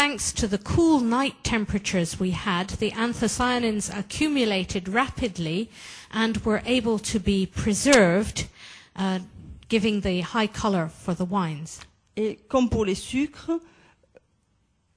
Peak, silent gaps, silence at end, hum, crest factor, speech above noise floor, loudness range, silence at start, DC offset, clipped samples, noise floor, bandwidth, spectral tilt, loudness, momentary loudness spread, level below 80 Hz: -2 dBFS; none; 1.35 s; none; 24 dB; 44 dB; 4 LU; 0 s; under 0.1%; under 0.1%; -68 dBFS; 11 kHz; -4.5 dB/octave; -25 LUFS; 10 LU; -44 dBFS